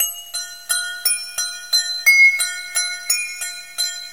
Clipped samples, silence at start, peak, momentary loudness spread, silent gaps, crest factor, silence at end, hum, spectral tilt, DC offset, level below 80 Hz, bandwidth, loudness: under 0.1%; 0 s; 0 dBFS; 16 LU; none; 20 dB; 0 s; none; 5.5 dB/octave; 0.4%; -70 dBFS; 17 kHz; -17 LUFS